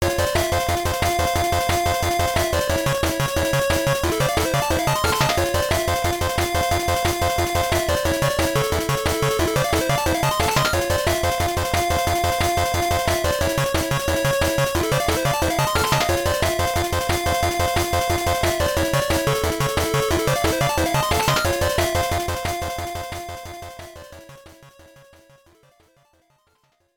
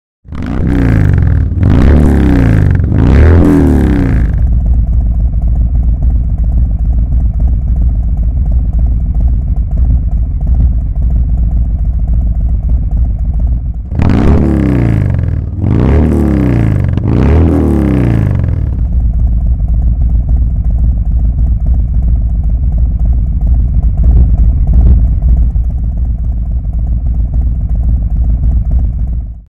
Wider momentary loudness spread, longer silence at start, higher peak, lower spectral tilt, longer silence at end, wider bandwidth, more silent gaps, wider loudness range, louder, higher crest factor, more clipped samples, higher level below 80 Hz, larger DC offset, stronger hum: second, 3 LU vs 6 LU; second, 0 s vs 0.3 s; second, -4 dBFS vs 0 dBFS; second, -4 dB/octave vs -10 dB/octave; first, 2.25 s vs 0.05 s; first, over 20 kHz vs 3.9 kHz; neither; about the same, 3 LU vs 5 LU; second, -20 LUFS vs -12 LUFS; first, 18 dB vs 8 dB; neither; second, -34 dBFS vs -10 dBFS; neither; neither